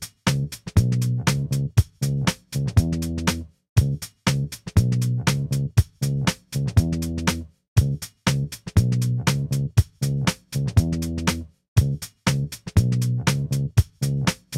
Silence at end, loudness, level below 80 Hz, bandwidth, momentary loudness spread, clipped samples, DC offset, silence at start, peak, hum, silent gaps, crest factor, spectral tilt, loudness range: 0 s; -23 LUFS; -34 dBFS; 16 kHz; 4 LU; under 0.1%; under 0.1%; 0 s; -4 dBFS; none; 3.69-3.76 s, 7.68-7.76 s, 11.68-11.76 s; 18 dB; -5.5 dB/octave; 1 LU